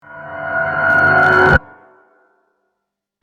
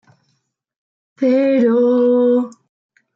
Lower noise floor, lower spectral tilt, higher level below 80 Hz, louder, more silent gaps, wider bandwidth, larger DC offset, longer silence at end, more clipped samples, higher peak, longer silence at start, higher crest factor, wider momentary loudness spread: first, -77 dBFS vs -68 dBFS; about the same, -6.5 dB/octave vs -7.5 dB/octave; first, -36 dBFS vs -76 dBFS; first, -12 LUFS vs -15 LUFS; neither; first, 10 kHz vs 7.2 kHz; neither; first, 1.65 s vs 0.65 s; neither; first, 0 dBFS vs -6 dBFS; second, 0.1 s vs 1.2 s; about the same, 16 dB vs 12 dB; first, 14 LU vs 6 LU